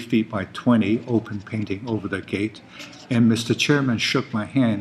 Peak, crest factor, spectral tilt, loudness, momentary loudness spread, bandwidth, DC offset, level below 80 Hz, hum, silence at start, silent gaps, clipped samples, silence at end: -6 dBFS; 16 dB; -5.5 dB/octave; -22 LUFS; 10 LU; 13 kHz; under 0.1%; -60 dBFS; none; 0 s; none; under 0.1%; 0 s